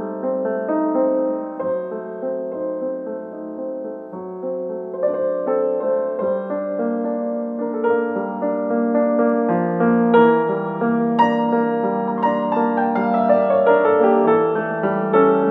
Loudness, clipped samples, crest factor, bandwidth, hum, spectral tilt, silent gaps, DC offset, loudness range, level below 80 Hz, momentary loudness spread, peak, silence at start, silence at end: -19 LUFS; under 0.1%; 16 dB; 5 kHz; none; -9.5 dB/octave; none; under 0.1%; 8 LU; -70 dBFS; 12 LU; -2 dBFS; 0 s; 0 s